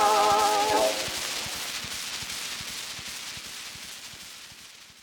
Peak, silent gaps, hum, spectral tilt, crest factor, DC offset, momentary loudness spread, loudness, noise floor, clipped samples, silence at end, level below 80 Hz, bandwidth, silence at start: -10 dBFS; none; none; -1 dB/octave; 20 dB; under 0.1%; 19 LU; -27 LUFS; -48 dBFS; under 0.1%; 0 s; -58 dBFS; 18 kHz; 0 s